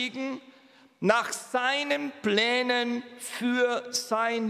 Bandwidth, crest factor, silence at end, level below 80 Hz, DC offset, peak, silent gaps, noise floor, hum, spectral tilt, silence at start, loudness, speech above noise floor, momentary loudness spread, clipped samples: 15.5 kHz; 22 dB; 0 s; -80 dBFS; under 0.1%; -6 dBFS; none; -57 dBFS; none; -3 dB/octave; 0 s; -27 LUFS; 29 dB; 11 LU; under 0.1%